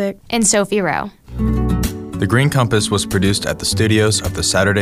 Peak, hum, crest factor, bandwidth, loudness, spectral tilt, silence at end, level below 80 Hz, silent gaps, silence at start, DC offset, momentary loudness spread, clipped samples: -2 dBFS; none; 14 dB; 16 kHz; -16 LUFS; -4 dB/octave; 0 s; -30 dBFS; none; 0 s; under 0.1%; 8 LU; under 0.1%